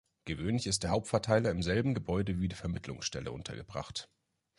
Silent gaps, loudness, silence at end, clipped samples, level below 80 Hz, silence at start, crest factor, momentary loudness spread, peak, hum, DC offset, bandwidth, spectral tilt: none; -34 LUFS; 0.55 s; under 0.1%; -50 dBFS; 0.25 s; 22 dB; 12 LU; -12 dBFS; none; under 0.1%; 11.5 kHz; -5 dB/octave